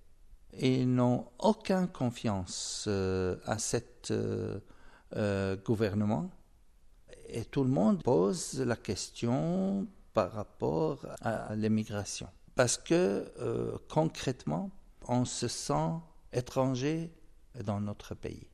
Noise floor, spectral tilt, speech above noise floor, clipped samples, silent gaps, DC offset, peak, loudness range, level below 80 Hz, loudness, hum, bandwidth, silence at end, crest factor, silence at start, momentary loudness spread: -59 dBFS; -5.5 dB/octave; 27 dB; under 0.1%; none; under 0.1%; -14 dBFS; 3 LU; -58 dBFS; -33 LUFS; none; 13 kHz; 0.05 s; 20 dB; 0.05 s; 12 LU